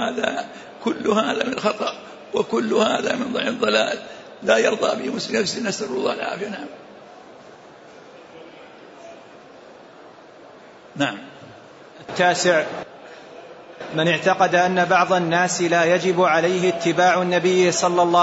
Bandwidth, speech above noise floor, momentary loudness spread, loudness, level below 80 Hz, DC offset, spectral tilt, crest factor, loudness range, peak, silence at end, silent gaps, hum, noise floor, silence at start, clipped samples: 8 kHz; 25 dB; 21 LU; -20 LUFS; -66 dBFS; under 0.1%; -4 dB/octave; 16 dB; 15 LU; -6 dBFS; 0 s; none; none; -44 dBFS; 0 s; under 0.1%